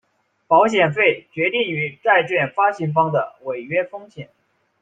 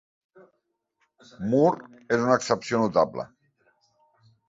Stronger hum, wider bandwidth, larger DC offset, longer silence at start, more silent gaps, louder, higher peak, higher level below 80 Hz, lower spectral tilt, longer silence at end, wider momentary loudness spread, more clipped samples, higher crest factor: neither; first, 9.2 kHz vs 8 kHz; neither; second, 0.5 s vs 1.4 s; neither; first, -19 LUFS vs -24 LUFS; first, -2 dBFS vs -6 dBFS; about the same, -66 dBFS vs -64 dBFS; about the same, -6 dB/octave vs -5.5 dB/octave; second, 0.6 s vs 1.2 s; about the same, 14 LU vs 14 LU; neither; about the same, 18 dB vs 22 dB